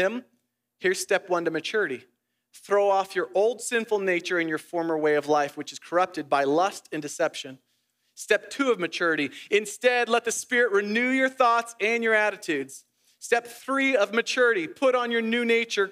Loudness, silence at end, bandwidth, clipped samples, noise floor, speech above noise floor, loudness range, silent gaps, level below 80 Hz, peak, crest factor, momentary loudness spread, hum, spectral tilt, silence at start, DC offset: -25 LUFS; 0 s; 15.5 kHz; under 0.1%; -73 dBFS; 48 dB; 4 LU; none; -88 dBFS; -6 dBFS; 20 dB; 8 LU; none; -3 dB/octave; 0 s; under 0.1%